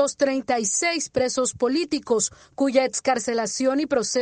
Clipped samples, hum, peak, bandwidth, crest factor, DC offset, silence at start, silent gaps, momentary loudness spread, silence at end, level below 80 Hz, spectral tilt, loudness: under 0.1%; none; -6 dBFS; 10 kHz; 16 dB; under 0.1%; 0 s; none; 3 LU; 0 s; -60 dBFS; -2.5 dB/octave; -23 LUFS